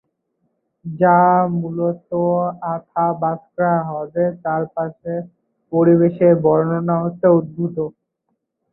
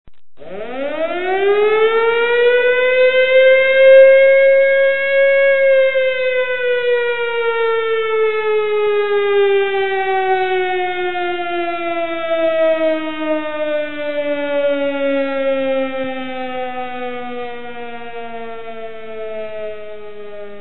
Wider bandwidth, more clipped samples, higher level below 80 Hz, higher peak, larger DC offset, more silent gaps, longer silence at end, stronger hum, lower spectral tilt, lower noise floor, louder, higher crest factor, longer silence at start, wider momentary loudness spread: second, 2.9 kHz vs 4.1 kHz; neither; about the same, -62 dBFS vs -58 dBFS; about the same, -2 dBFS vs 0 dBFS; second, under 0.1% vs 3%; neither; first, 0.8 s vs 0 s; neither; first, -14.5 dB/octave vs -8.5 dB/octave; first, -73 dBFS vs -36 dBFS; second, -18 LUFS vs -15 LUFS; about the same, 16 dB vs 16 dB; first, 0.85 s vs 0.05 s; second, 13 LU vs 19 LU